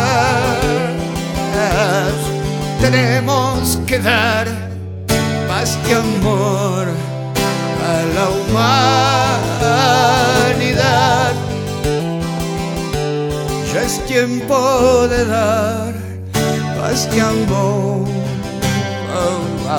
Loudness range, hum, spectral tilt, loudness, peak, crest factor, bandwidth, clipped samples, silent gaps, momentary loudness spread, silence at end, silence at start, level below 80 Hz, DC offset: 4 LU; none; -5 dB/octave; -16 LUFS; 0 dBFS; 14 dB; 19.5 kHz; under 0.1%; none; 8 LU; 0 s; 0 s; -34 dBFS; under 0.1%